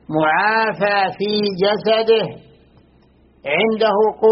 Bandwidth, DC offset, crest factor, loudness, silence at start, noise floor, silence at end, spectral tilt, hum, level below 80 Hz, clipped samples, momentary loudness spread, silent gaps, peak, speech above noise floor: 5.8 kHz; under 0.1%; 14 dB; -17 LUFS; 0.1 s; -52 dBFS; 0 s; -2.5 dB/octave; none; -58 dBFS; under 0.1%; 4 LU; none; -4 dBFS; 36 dB